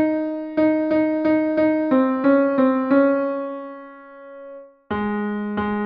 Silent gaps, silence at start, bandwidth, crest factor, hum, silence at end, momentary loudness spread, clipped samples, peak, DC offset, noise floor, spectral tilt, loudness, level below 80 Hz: none; 0 s; 5.2 kHz; 16 dB; none; 0 s; 21 LU; under 0.1%; -6 dBFS; under 0.1%; -40 dBFS; -9.5 dB/octave; -20 LUFS; -56 dBFS